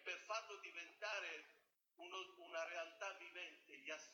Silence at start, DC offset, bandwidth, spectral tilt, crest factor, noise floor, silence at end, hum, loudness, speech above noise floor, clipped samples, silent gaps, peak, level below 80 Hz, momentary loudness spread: 0 s; under 0.1%; 19 kHz; 1 dB/octave; 20 dB; -76 dBFS; 0 s; none; -50 LUFS; 24 dB; under 0.1%; none; -32 dBFS; under -90 dBFS; 9 LU